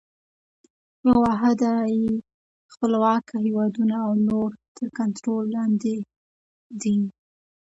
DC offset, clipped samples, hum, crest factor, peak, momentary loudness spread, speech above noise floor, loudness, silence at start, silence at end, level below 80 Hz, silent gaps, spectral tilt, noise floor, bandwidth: under 0.1%; under 0.1%; none; 16 dB; -8 dBFS; 11 LU; over 68 dB; -23 LUFS; 1.05 s; 0.65 s; -56 dBFS; 2.34-2.69 s, 4.68-4.75 s, 6.16-6.70 s; -7 dB/octave; under -90 dBFS; 8 kHz